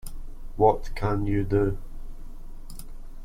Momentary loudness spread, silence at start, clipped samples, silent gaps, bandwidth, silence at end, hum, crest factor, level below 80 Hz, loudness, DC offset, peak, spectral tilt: 25 LU; 0.05 s; under 0.1%; none; 15.5 kHz; 0 s; none; 20 dB; -34 dBFS; -25 LUFS; under 0.1%; -6 dBFS; -8 dB/octave